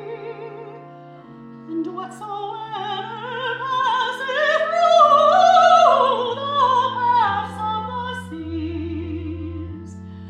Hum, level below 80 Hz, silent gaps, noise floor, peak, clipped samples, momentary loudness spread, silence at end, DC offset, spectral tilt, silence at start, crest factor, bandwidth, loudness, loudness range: none; -50 dBFS; none; -41 dBFS; -2 dBFS; under 0.1%; 20 LU; 0 s; under 0.1%; -4.5 dB/octave; 0 s; 18 dB; 10 kHz; -19 LUFS; 14 LU